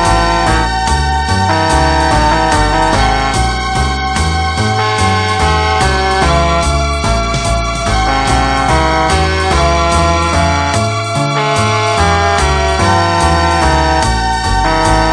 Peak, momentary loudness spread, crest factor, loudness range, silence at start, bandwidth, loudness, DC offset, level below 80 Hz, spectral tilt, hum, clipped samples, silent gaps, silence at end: 0 dBFS; 3 LU; 12 dB; 1 LU; 0 s; 10 kHz; -12 LUFS; under 0.1%; -18 dBFS; -4.5 dB/octave; none; under 0.1%; none; 0 s